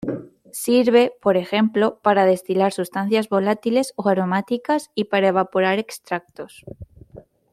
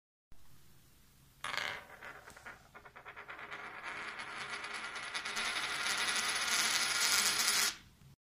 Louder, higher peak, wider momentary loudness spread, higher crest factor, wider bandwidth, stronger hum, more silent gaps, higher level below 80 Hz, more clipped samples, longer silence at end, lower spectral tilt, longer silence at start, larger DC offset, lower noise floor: first, -20 LUFS vs -34 LUFS; first, -2 dBFS vs -14 dBFS; second, 15 LU vs 22 LU; second, 18 dB vs 26 dB; about the same, 15.5 kHz vs 15.5 kHz; neither; neither; first, -60 dBFS vs -70 dBFS; neither; first, 0.35 s vs 0.1 s; first, -5.5 dB/octave vs 1 dB/octave; second, 0 s vs 0.3 s; neither; second, -46 dBFS vs -64 dBFS